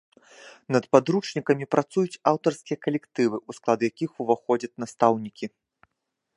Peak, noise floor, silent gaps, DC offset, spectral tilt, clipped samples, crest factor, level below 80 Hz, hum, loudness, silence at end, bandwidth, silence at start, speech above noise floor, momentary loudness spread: -2 dBFS; -81 dBFS; none; under 0.1%; -6 dB/octave; under 0.1%; 24 dB; -72 dBFS; none; -25 LUFS; 0.9 s; 11.5 kHz; 0.45 s; 57 dB; 10 LU